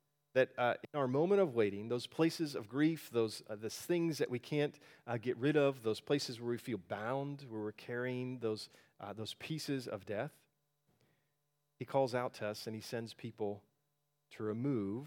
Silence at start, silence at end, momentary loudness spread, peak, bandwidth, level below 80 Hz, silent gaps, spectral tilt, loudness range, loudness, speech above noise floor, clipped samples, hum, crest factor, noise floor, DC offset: 0.35 s; 0 s; 12 LU; -18 dBFS; 18.5 kHz; -86 dBFS; none; -6 dB/octave; 7 LU; -38 LUFS; 47 dB; under 0.1%; none; 20 dB; -84 dBFS; under 0.1%